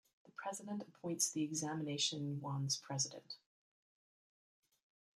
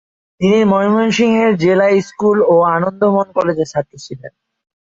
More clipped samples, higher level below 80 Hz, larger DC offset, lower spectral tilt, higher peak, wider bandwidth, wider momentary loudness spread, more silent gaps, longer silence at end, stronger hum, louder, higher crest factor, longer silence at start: neither; second, -86 dBFS vs -54 dBFS; neither; second, -3.5 dB/octave vs -6.5 dB/octave; second, -22 dBFS vs -2 dBFS; first, 14.5 kHz vs 7.8 kHz; first, 14 LU vs 11 LU; neither; first, 1.85 s vs 0.65 s; neither; second, -40 LUFS vs -14 LUFS; first, 20 dB vs 12 dB; about the same, 0.4 s vs 0.4 s